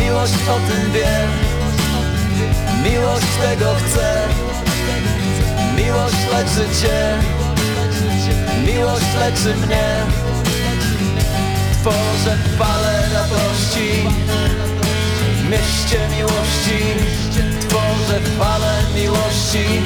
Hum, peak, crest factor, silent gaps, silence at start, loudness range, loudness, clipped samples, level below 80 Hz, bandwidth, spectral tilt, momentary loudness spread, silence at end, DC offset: none; -6 dBFS; 10 dB; none; 0 s; 0 LU; -17 LUFS; under 0.1%; -24 dBFS; 19 kHz; -5 dB/octave; 2 LU; 0 s; under 0.1%